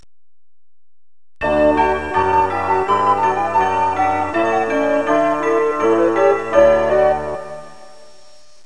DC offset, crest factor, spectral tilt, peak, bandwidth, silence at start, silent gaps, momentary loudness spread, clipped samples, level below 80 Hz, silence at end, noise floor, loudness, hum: 1%; 16 dB; -6 dB/octave; -2 dBFS; 10.5 kHz; 1.4 s; none; 6 LU; under 0.1%; -44 dBFS; 0.9 s; -49 dBFS; -16 LUFS; none